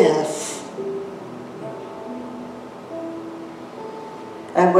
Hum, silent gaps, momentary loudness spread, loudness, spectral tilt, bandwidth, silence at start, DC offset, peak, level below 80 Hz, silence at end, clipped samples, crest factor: none; none; 12 LU; -29 LUFS; -5 dB/octave; 14.5 kHz; 0 s; under 0.1%; -2 dBFS; -70 dBFS; 0 s; under 0.1%; 22 dB